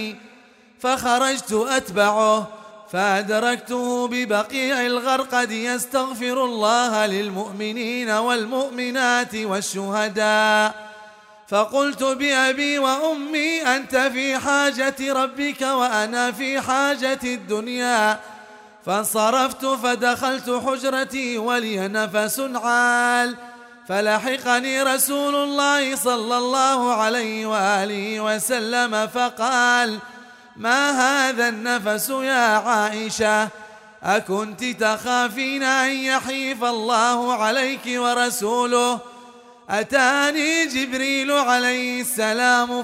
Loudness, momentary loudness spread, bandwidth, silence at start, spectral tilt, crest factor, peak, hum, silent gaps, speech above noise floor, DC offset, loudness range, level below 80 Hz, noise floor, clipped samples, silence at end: -20 LUFS; 7 LU; 16 kHz; 0 s; -2.5 dB/octave; 18 dB; -4 dBFS; none; none; 29 dB; under 0.1%; 2 LU; -64 dBFS; -50 dBFS; under 0.1%; 0 s